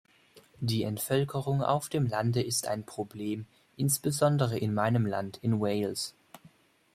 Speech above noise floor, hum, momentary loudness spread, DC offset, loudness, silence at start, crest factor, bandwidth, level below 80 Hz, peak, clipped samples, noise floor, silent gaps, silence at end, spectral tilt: 31 dB; none; 10 LU; under 0.1%; -30 LUFS; 0.35 s; 20 dB; 16 kHz; -64 dBFS; -12 dBFS; under 0.1%; -61 dBFS; none; 0.6 s; -5.5 dB/octave